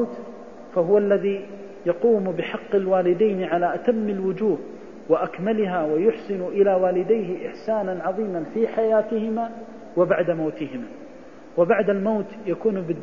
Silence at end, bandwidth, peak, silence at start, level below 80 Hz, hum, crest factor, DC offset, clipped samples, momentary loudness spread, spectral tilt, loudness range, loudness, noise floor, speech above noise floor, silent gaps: 0 s; 7 kHz; -6 dBFS; 0 s; -64 dBFS; none; 16 dB; 0.4%; under 0.1%; 12 LU; -8.5 dB/octave; 2 LU; -23 LUFS; -43 dBFS; 21 dB; none